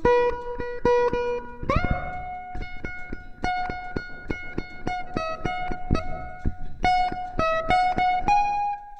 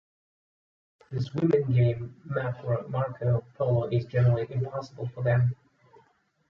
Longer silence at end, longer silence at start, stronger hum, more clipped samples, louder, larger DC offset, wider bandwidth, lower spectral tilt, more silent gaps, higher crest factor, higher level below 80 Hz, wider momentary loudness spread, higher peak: second, 0 s vs 0.95 s; second, 0 s vs 1.1 s; neither; neither; about the same, -26 LUFS vs -28 LUFS; neither; first, 8.6 kHz vs 6 kHz; second, -6 dB/octave vs -9.5 dB/octave; neither; about the same, 20 dB vs 18 dB; first, -36 dBFS vs -56 dBFS; first, 14 LU vs 10 LU; first, -6 dBFS vs -10 dBFS